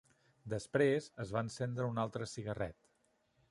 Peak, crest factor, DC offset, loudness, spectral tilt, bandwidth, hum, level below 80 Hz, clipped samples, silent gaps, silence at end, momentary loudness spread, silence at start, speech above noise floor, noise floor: -18 dBFS; 20 dB; under 0.1%; -38 LUFS; -6 dB/octave; 11.5 kHz; none; -66 dBFS; under 0.1%; none; 0.8 s; 11 LU; 0.45 s; 40 dB; -77 dBFS